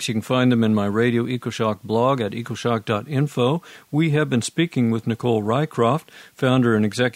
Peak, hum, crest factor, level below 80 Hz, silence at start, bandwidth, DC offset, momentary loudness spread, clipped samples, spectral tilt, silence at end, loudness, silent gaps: -4 dBFS; none; 16 dB; -62 dBFS; 0 s; 15.5 kHz; under 0.1%; 6 LU; under 0.1%; -6.5 dB/octave; 0.05 s; -21 LUFS; none